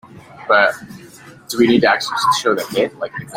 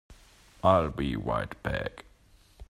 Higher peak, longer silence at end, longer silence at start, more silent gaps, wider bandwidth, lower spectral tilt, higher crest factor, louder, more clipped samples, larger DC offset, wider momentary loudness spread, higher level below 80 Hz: first, 0 dBFS vs -6 dBFS; about the same, 0 s vs 0.05 s; about the same, 0.15 s vs 0.1 s; neither; first, 16.5 kHz vs 13.5 kHz; second, -4 dB/octave vs -7 dB/octave; second, 16 dB vs 24 dB; first, -16 LUFS vs -29 LUFS; neither; neither; first, 17 LU vs 10 LU; second, -56 dBFS vs -46 dBFS